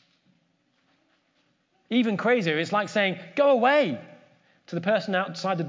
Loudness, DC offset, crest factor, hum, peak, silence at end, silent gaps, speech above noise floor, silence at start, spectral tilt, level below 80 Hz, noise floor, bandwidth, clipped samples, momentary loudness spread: -24 LUFS; under 0.1%; 18 dB; none; -10 dBFS; 0 s; none; 46 dB; 1.9 s; -6 dB/octave; -82 dBFS; -69 dBFS; 7.6 kHz; under 0.1%; 9 LU